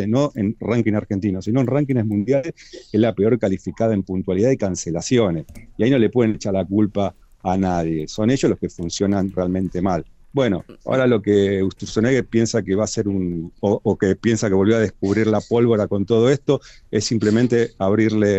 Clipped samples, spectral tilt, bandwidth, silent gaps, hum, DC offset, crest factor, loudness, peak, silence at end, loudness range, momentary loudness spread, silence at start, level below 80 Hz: under 0.1%; -6.5 dB/octave; 8.4 kHz; none; none; under 0.1%; 14 dB; -20 LUFS; -4 dBFS; 0 s; 3 LU; 7 LU; 0 s; -48 dBFS